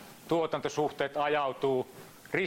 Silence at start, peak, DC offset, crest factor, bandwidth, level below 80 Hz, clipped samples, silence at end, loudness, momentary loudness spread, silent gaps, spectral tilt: 0 s; -14 dBFS; under 0.1%; 18 dB; 16.5 kHz; -68 dBFS; under 0.1%; 0 s; -31 LUFS; 6 LU; none; -5 dB/octave